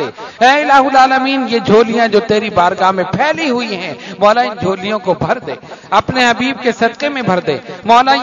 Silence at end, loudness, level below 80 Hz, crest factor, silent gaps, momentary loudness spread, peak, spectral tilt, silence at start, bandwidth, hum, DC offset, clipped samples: 0 s; -12 LUFS; -48 dBFS; 12 dB; none; 10 LU; 0 dBFS; -5 dB/octave; 0 s; 7.6 kHz; none; under 0.1%; 0.2%